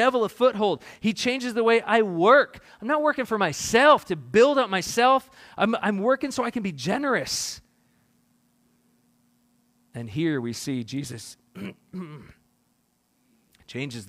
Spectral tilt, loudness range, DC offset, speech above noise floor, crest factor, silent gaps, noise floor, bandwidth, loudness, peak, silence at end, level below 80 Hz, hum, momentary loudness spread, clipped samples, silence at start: -4 dB/octave; 14 LU; under 0.1%; 46 dB; 20 dB; none; -69 dBFS; 15.5 kHz; -23 LUFS; -4 dBFS; 0.05 s; -62 dBFS; none; 21 LU; under 0.1%; 0 s